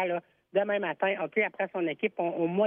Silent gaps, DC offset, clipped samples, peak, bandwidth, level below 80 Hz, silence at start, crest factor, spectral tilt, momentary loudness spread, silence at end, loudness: none; under 0.1%; under 0.1%; -14 dBFS; 3.7 kHz; -82 dBFS; 0 s; 16 dB; -9 dB/octave; 4 LU; 0 s; -30 LUFS